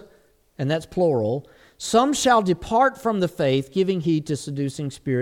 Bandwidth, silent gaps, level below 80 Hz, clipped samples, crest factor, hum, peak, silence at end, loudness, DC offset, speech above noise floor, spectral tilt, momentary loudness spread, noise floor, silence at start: 17 kHz; none; -52 dBFS; under 0.1%; 18 dB; none; -6 dBFS; 0 s; -22 LUFS; under 0.1%; 36 dB; -5.5 dB/octave; 10 LU; -58 dBFS; 0.6 s